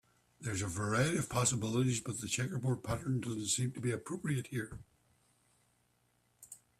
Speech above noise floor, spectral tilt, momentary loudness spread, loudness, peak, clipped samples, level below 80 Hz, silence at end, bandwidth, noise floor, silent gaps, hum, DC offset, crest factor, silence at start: 40 dB; -4.5 dB/octave; 11 LU; -35 LUFS; -18 dBFS; under 0.1%; -62 dBFS; 0.25 s; 14.5 kHz; -75 dBFS; none; none; under 0.1%; 20 dB; 0.4 s